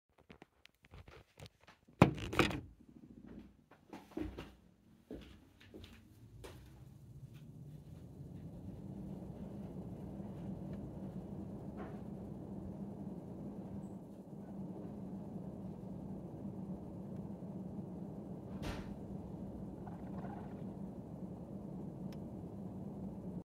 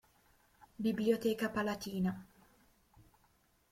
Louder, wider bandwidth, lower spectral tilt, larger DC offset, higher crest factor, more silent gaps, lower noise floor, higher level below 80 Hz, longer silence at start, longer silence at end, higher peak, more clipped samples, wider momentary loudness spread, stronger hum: second, -44 LUFS vs -36 LUFS; about the same, 16 kHz vs 16.5 kHz; about the same, -7 dB/octave vs -6 dB/octave; neither; first, 36 dB vs 20 dB; neither; second, -67 dBFS vs -72 dBFS; first, -60 dBFS vs -68 dBFS; second, 0.2 s vs 0.6 s; second, 0.05 s vs 1.5 s; first, -10 dBFS vs -18 dBFS; neither; first, 12 LU vs 6 LU; neither